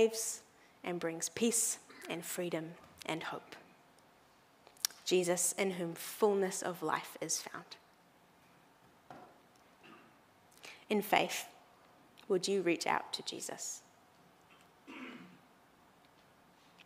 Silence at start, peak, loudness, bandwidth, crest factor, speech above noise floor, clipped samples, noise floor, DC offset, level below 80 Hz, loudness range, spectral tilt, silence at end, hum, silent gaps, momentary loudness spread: 0 s; -12 dBFS; -36 LUFS; 16 kHz; 28 dB; 30 dB; under 0.1%; -66 dBFS; under 0.1%; -84 dBFS; 11 LU; -3 dB/octave; 0.05 s; none; none; 23 LU